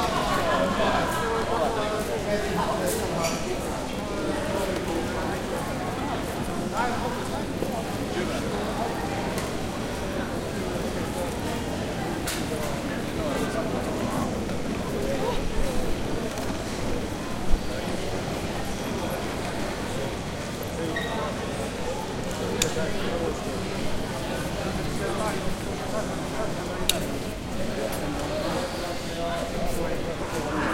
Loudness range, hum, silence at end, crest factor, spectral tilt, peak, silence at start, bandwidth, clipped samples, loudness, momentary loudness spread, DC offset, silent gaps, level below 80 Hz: 3 LU; none; 0 s; 26 dB; -4.5 dB/octave; -2 dBFS; 0 s; 16.5 kHz; under 0.1%; -29 LUFS; 5 LU; under 0.1%; none; -38 dBFS